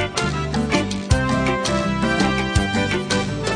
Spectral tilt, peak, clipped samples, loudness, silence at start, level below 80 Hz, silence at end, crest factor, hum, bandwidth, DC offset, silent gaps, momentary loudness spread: -5 dB/octave; -4 dBFS; under 0.1%; -20 LUFS; 0 s; -32 dBFS; 0 s; 18 dB; none; 10.5 kHz; under 0.1%; none; 3 LU